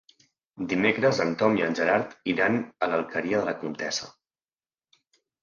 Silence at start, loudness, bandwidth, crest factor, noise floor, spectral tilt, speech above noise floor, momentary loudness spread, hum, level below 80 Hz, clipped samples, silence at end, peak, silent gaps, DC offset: 0.55 s; -26 LUFS; 9.8 kHz; 20 dB; under -90 dBFS; -5 dB/octave; over 64 dB; 8 LU; none; -66 dBFS; under 0.1%; 1.3 s; -8 dBFS; none; under 0.1%